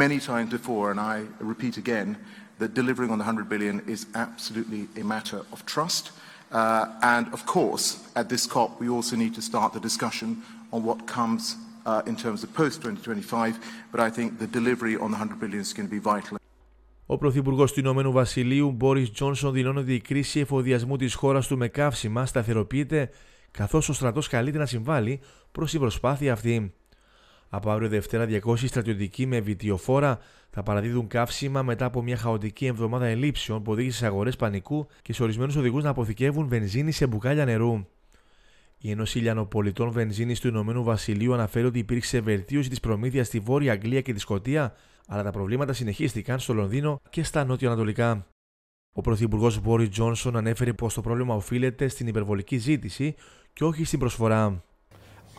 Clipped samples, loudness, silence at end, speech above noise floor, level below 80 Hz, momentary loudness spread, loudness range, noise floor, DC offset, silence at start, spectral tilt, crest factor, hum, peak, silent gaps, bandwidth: under 0.1%; -27 LUFS; 0.2 s; 32 dB; -48 dBFS; 8 LU; 4 LU; -58 dBFS; under 0.1%; 0 s; -6 dB/octave; 20 dB; none; -6 dBFS; 48.32-48.93 s; 16.5 kHz